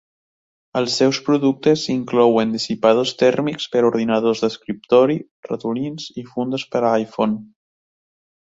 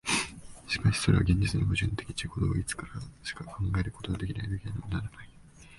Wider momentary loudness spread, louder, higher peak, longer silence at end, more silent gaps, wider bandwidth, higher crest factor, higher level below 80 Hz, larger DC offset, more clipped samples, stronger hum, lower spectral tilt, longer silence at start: second, 11 LU vs 14 LU; first, -19 LUFS vs -31 LUFS; first, -2 dBFS vs -10 dBFS; first, 1 s vs 0 s; first, 5.31-5.43 s vs none; second, 8 kHz vs 11.5 kHz; about the same, 18 dB vs 20 dB; second, -62 dBFS vs -42 dBFS; neither; neither; neither; about the same, -5.5 dB/octave vs -5 dB/octave; first, 0.75 s vs 0.05 s